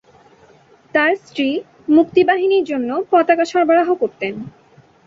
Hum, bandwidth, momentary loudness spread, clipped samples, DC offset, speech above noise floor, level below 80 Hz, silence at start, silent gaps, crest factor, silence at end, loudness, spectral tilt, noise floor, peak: none; 7.6 kHz; 11 LU; under 0.1%; under 0.1%; 33 dB; -62 dBFS; 0.95 s; none; 16 dB; 0.6 s; -16 LUFS; -5.5 dB/octave; -49 dBFS; -2 dBFS